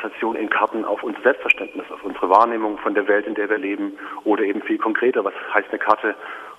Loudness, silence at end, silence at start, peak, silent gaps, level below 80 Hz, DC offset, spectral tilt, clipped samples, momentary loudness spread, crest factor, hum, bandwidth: -20 LUFS; 0.05 s; 0 s; 0 dBFS; none; -66 dBFS; under 0.1%; -5.5 dB/octave; under 0.1%; 10 LU; 20 dB; none; 12 kHz